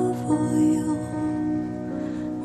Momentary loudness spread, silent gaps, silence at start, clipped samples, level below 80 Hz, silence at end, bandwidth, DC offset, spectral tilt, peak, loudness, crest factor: 9 LU; none; 0 s; under 0.1%; -52 dBFS; 0 s; 12.5 kHz; under 0.1%; -7.5 dB/octave; -12 dBFS; -25 LUFS; 12 dB